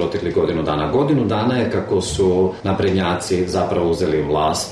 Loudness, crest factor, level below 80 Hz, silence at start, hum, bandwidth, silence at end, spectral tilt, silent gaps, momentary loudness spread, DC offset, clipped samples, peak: -19 LUFS; 10 dB; -40 dBFS; 0 s; none; 13.5 kHz; 0 s; -5.5 dB/octave; none; 3 LU; under 0.1%; under 0.1%; -8 dBFS